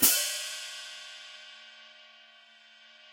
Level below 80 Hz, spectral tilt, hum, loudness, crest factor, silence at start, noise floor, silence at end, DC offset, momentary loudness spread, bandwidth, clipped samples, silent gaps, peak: -74 dBFS; 1 dB/octave; none; -30 LUFS; 26 dB; 0 s; -57 dBFS; 1.05 s; under 0.1%; 25 LU; 16.5 kHz; under 0.1%; none; -8 dBFS